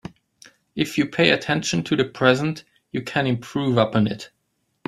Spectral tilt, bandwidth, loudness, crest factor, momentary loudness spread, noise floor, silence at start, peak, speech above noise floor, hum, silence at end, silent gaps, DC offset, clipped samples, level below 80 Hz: -5 dB/octave; 15 kHz; -21 LUFS; 22 dB; 16 LU; -53 dBFS; 0.05 s; -2 dBFS; 32 dB; none; 0.6 s; none; under 0.1%; under 0.1%; -58 dBFS